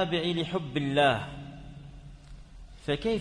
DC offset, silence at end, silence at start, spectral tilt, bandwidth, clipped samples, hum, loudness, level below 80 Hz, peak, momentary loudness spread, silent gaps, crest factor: under 0.1%; 0 s; 0 s; -6 dB/octave; 10.5 kHz; under 0.1%; none; -29 LUFS; -50 dBFS; -12 dBFS; 24 LU; none; 18 dB